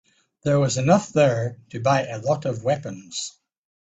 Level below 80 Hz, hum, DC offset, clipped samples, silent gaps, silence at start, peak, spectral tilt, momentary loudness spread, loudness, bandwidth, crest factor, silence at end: -58 dBFS; none; under 0.1%; under 0.1%; none; 0.45 s; -4 dBFS; -5.5 dB/octave; 12 LU; -23 LUFS; 9.2 kHz; 18 dB; 0.5 s